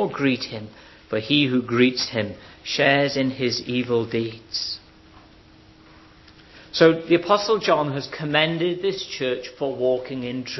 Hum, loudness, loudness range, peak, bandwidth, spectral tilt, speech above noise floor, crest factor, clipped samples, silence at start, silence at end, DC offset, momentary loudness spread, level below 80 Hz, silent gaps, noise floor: none; -22 LUFS; 6 LU; -2 dBFS; 6.2 kHz; -5 dB/octave; 28 dB; 20 dB; under 0.1%; 0 s; 0 s; under 0.1%; 12 LU; -58 dBFS; none; -50 dBFS